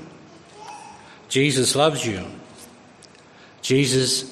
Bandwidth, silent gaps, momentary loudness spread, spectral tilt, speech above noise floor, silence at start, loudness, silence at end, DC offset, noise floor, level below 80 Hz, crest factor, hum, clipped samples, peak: 13.5 kHz; none; 23 LU; -3.5 dB/octave; 28 dB; 0 s; -20 LUFS; 0 s; under 0.1%; -48 dBFS; -62 dBFS; 20 dB; none; under 0.1%; -4 dBFS